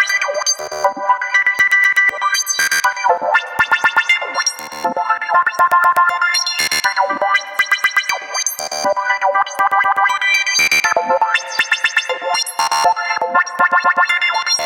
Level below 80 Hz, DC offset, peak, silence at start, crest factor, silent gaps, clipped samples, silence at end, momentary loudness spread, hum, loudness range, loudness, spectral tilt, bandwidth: -62 dBFS; under 0.1%; -2 dBFS; 0 s; 14 dB; none; under 0.1%; 0 s; 6 LU; none; 2 LU; -14 LUFS; 1 dB/octave; 17 kHz